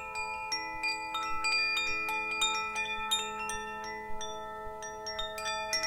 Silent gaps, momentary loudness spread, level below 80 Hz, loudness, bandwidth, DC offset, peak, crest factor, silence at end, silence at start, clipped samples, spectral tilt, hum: none; 11 LU; -56 dBFS; -33 LUFS; 17 kHz; under 0.1%; -18 dBFS; 18 dB; 0 s; 0 s; under 0.1%; 0 dB/octave; none